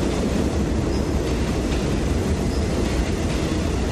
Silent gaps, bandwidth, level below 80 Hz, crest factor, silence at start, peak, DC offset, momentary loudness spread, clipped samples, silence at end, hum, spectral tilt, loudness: none; 14 kHz; -26 dBFS; 12 dB; 0 s; -10 dBFS; under 0.1%; 1 LU; under 0.1%; 0 s; none; -6 dB/octave; -23 LUFS